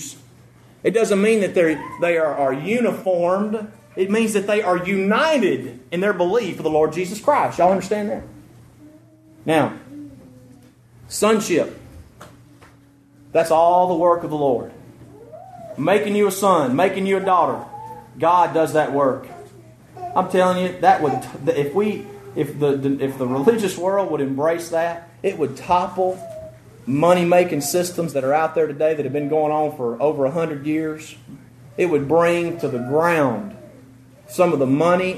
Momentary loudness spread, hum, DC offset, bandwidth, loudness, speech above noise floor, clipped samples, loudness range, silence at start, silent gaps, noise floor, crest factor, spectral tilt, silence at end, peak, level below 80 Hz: 13 LU; none; under 0.1%; 13.5 kHz; -19 LUFS; 32 dB; under 0.1%; 4 LU; 0 s; none; -51 dBFS; 18 dB; -5.5 dB/octave; 0 s; -2 dBFS; -58 dBFS